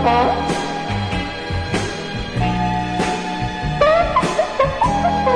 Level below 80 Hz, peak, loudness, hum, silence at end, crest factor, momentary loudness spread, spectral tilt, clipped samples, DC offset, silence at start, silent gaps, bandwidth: -32 dBFS; -4 dBFS; -19 LUFS; none; 0 s; 14 dB; 8 LU; -5.5 dB/octave; under 0.1%; under 0.1%; 0 s; none; 10.5 kHz